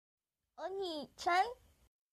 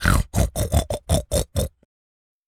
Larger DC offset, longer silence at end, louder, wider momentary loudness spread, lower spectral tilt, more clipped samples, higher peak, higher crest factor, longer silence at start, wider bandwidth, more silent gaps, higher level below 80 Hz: neither; second, 0.6 s vs 0.8 s; second, -38 LUFS vs -23 LUFS; first, 14 LU vs 6 LU; second, -2.5 dB/octave vs -5 dB/octave; neither; second, -20 dBFS vs -2 dBFS; about the same, 20 dB vs 22 dB; first, 0.6 s vs 0 s; second, 14 kHz vs 19 kHz; neither; second, -74 dBFS vs -28 dBFS